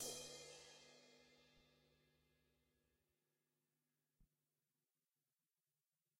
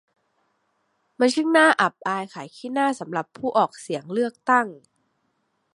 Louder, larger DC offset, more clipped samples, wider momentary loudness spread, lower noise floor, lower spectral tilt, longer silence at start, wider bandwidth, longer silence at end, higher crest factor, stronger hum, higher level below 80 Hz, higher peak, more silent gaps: second, -56 LUFS vs -22 LUFS; neither; neither; first, 17 LU vs 14 LU; first, under -90 dBFS vs -72 dBFS; second, -1 dB/octave vs -4 dB/octave; second, 0 s vs 1.2 s; first, 15.5 kHz vs 11.5 kHz; first, 1.95 s vs 1 s; first, 26 dB vs 20 dB; neither; second, -86 dBFS vs -76 dBFS; second, -38 dBFS vs -4 dBFS; neither